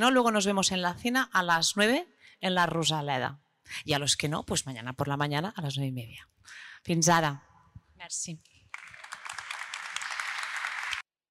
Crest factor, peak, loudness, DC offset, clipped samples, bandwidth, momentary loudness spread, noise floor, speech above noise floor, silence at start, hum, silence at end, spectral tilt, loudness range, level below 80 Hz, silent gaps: 18 dB; -12 dBFS; -29 LUFS; under 0.1%; under 0.1%; 16 kHz; 20 LU; -55 dBFS; 27 dB; 0 s; none; 0.3 s; -3.5 dB/octave; 9 LU; -64 dBFS; none